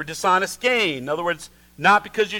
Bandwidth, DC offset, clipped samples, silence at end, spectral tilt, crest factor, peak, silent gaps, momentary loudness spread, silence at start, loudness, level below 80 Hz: 19 kHz; under 0.1%; under 0.1%; 0 s; -3 dB/octave; 18 dB; -4 dBFS; none; 8 LU; 0 s; -20 LUFS; -56 dBFS